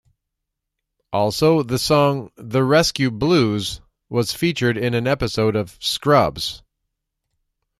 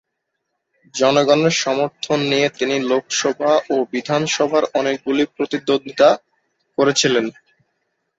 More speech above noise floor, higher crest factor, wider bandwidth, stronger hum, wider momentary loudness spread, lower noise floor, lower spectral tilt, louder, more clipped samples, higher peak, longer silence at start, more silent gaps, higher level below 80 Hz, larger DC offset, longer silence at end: first, 62 dB vs 58 dB; about the same, 18 dB vs 18 dB; first, 15 kHz vs 8 kHz; neither; first, 10 LU vs 6 LU; first, -80 dBFS vs -75 dBFS; first, -5 dB/octave vs -3.5 dB/octave; about the same, -19 LUFS vs -18 LUFS; neither; about the same, -2 dBFS vs -2 dBFS; first, 1.1 s vs 0.95 s; neither; first, -46 dBFS vs -62 dBFS; neither; first, 1.25 s vs 0.85 s